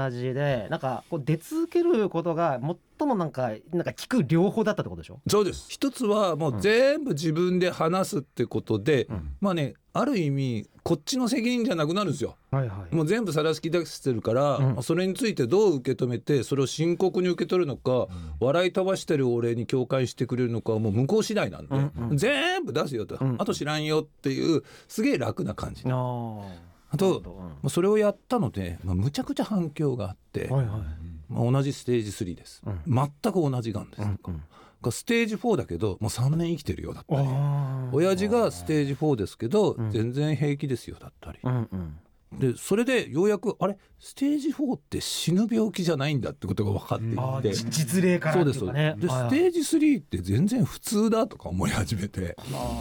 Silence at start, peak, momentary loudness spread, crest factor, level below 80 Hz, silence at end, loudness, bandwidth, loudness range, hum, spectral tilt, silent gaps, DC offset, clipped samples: 0 s; -12 dBFS; 9 LU; 14 dB; -50 dBFS; 0 s; -26 LUFS; 19 kHz; 4 LU; none; -6 dB/octave; none; under 0.1%; under 0.1%